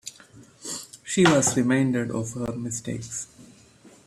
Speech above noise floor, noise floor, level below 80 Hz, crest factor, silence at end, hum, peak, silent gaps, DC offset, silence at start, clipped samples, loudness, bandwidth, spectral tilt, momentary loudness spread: 29 dB; -53 dBFS; -58 dBFS; 20 dB; 0.2 s; none; -6 dBFS; none; under 0.1%; 0.05 s; under 0.1%; -24 LUFS; 14.5 kHz; -4.5 dB/octave; 16 LU